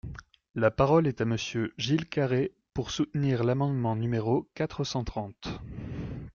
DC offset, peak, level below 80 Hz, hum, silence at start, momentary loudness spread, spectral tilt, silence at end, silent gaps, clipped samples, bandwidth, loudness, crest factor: under 0.1%; -10 dBFS; -50 dBFS; none; 0.05 s; 14 LU; -6.5 dB/octave; 0.05 s; 0.50-0.54 s; under 0.1%; 7.2 kHz; -29 LUFS; 18 dB